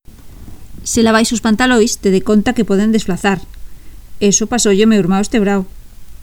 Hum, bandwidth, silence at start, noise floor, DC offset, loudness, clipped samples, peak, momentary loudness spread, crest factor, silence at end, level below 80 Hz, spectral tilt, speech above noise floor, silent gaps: none; 19 kHz; 0.2 s; -33 dBFS; under 0.1%; -13 LUFS; under 0.1%; 0 dBFS; 7 LU; 14 dB; 0 s; -34 dBFS; -4.5 dB/octave; 21 dB; none